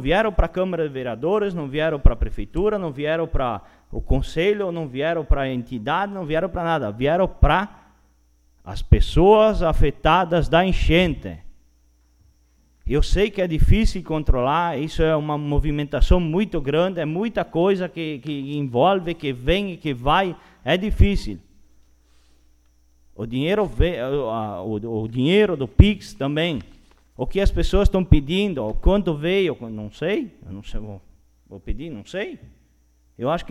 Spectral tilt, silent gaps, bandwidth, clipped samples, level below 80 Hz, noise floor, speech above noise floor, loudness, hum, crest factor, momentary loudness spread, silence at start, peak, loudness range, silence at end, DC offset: -7 dB/octave; none; 12 kHz; under 0.1%; -26 dBFS; -59 dBFS; 39 dB; -22 LUFS; none; 20 dB; 14 LU; 0 s; 0 dBFS; 7 LU; 0 s; under 0.1%